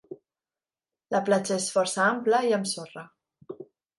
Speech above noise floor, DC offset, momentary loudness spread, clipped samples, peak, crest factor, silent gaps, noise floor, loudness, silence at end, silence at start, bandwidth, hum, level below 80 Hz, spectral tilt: over 65 dB; under 0.1%; 21 LU; under 0.1%; -10 dBFS; 20 dB; none; under -90 dBFS; -25 LUFS; 0.35 s; 0.1 s; 11.5 kHz; none; -78 dBFS; -3.5 dB/octave